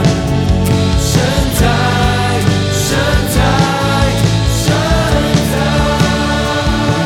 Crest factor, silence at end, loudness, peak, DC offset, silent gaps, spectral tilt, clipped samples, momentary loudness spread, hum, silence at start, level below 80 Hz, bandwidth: 12 dB; 0 s; -13 LUFS; 0 dBFS; under 0.1%; none; -5 dB/octave; under 0.1%; 2 LU; none; 0 s; -20 dBFS; 17.5 kHz